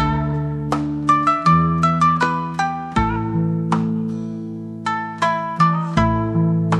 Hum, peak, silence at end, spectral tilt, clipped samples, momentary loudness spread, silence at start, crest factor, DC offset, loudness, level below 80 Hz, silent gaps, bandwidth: none; -4 dBFS; 0 s; -7 dB/octave; under 0.1%; 9 LU; 0 s; 16 dB; under 0.1%; -19 LUFS; -36 dBFS; none; 9.4 kHz